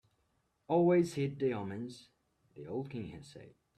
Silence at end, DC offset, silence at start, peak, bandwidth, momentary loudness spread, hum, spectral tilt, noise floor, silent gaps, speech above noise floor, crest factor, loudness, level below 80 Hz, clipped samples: 0.3 s; under 0.1%; 0.7 s; -18 dBFS; 11.5 kHz; 23 LU; none; -7.5 dB/octave; -77 dBFS; none; 43 dB; 18 dB; -34 LUFS; -72 dBFS; under 0.1%